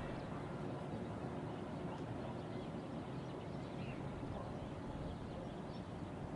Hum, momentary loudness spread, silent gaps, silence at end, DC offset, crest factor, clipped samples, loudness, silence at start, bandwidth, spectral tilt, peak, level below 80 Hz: none; 2 LU; none; 0 s; under 0.1%; 12 dB; under 0.1%; -46 LUFS; 0 s; 11 kHz; -7.5 dB/octave; -32 dBFS; -60 dBFS